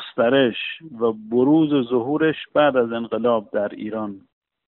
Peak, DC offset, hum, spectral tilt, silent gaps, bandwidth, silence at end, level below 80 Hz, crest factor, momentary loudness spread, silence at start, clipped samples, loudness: -4 dBFS; under 0.1%; none; -4 dB/octave; none; 4.2 kHz; 0.6 s; -64 dBFS; 16 dB; 11 LU; 0 s; under 0.1%; -21 LUFS